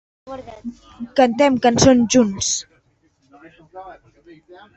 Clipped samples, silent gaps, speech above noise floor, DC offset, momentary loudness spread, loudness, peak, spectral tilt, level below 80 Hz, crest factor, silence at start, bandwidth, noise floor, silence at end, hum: under 0.1%; none; 43 dB; under 0.1%; 24 LU; -16 LUFS; -2 dBFS; -4 dB/octave; -46 dBFS; 18 dB; 0.25 s; 8.4 kHz; -61 dBFS; 0.85 s; none